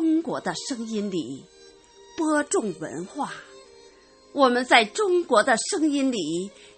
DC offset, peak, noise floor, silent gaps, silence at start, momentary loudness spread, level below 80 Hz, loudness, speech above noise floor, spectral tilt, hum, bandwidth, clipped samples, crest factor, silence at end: under 0.1%; -4 dBFS; -53 dBFS; none; 0 s; 15 LU; -68 dBFS; -24 LUFS; 29 dB; -3 dB/octave; none; 8.8 kHz; under 0.1%; 22 dB; 0.3 s